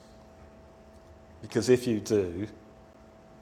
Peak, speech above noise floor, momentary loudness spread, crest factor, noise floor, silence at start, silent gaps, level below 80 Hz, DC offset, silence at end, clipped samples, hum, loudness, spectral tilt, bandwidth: -10 dBFS; 26 dB; 15 LU; 22 dB; -53 dBFS; 0.4 s; none; -60 dBFS; under 0.1%; 0.85 s; under 0.1%; none; -28 LUFS; -6 dB/octave; 14.5 kHz